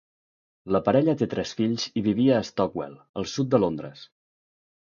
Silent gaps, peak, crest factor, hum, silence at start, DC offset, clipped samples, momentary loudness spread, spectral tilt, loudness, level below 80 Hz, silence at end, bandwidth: 3.09-3.14 s; -6 dBFS; 20 dB; none; 0.65 s; under 0.1%; under 0.1%; 13 LU; -6.5 dB/octave; -25 LUFS; -58 dBFS; 0.95 s; 7.2 kHz